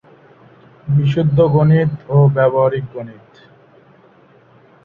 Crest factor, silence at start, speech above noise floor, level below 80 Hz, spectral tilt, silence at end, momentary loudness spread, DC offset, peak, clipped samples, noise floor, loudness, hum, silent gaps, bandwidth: 14 dB; 0.85 s; 35 dB; -50 dBFS; -10.5 dB/octave; 1.7 s; 18 LU; under 0.1%; -2 dBFS; under 0.1%; -48 dBFS; -14 LUFS; none; none; 4.4 kHz